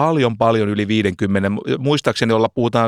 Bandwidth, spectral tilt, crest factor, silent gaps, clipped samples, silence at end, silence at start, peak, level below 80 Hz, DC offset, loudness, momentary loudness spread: 14 kHz; -6.5 dB/octave; 14 dB; none; under 0.1%; 0 s; 0 s; -2 dBFS; -52 dBFS; under 0.1%; -18 LUFS; 3 LU